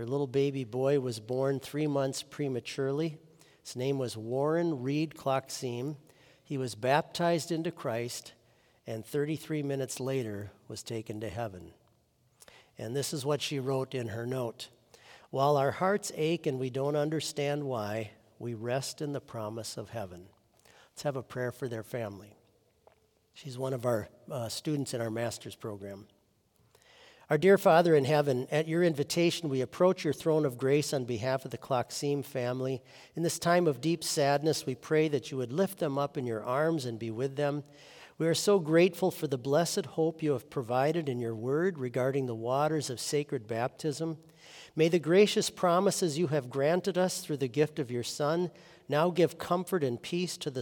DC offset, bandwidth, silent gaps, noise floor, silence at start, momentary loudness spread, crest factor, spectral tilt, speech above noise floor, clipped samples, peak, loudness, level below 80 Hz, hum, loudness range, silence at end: under 0.1%; 18 kHz; none; -69 dBFS; 0 s; 13 LU; 20 dB; -5.5 dB/octave; 39 dB; under 0.1%; -10 dBFS; -31 LUFS; -74 dBFS; none; 10 LU; 0 s